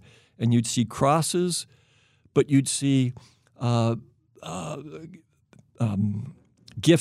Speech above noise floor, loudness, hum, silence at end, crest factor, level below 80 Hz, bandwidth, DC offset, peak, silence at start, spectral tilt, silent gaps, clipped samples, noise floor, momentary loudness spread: 37 dB; -25 LUFS; none; 0 s; 20 dB; -64 dBFS; 14.5 kHz; under 0.1%; -6 dBFS; 0.4 s; -5.5 dB/octave; none; under 0.1%; -62 dBFS; 20 LU